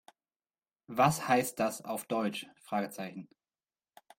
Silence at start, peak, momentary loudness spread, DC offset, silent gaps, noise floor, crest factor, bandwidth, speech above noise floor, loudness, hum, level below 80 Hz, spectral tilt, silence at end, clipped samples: 0.9 s; -12 dBFS; 14 LU; under 0.1%; none; under -90 dBFS; 22 dB; 16.5 kHz; over 58 dB; -32 LUFS; none; -72 dBFS; -4.5 dB/octave; 0.95 s; under 0.1%